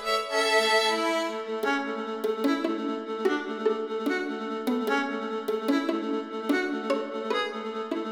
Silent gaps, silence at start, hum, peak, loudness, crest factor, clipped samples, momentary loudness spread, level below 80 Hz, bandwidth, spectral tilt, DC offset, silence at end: none; 0 s; none; -12 dBFS; -28 LUFS; 16 dB; under 0.1%; 8 LU; -72 dBFS; 17 kHz; -3 dB/octave; under 0.1%; 0 s